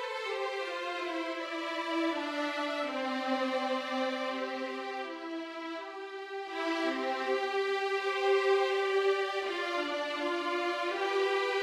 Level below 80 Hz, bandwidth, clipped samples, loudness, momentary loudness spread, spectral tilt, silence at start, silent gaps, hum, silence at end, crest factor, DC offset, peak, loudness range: -84 dBFS; 12.5 kHz; under 0.1%; -33 LUFS; 10 LU; -1.5 dB/octave; 0 s; none; none; 0 s; 16 dB; under 0.1%; -18 dBFS; 5 LU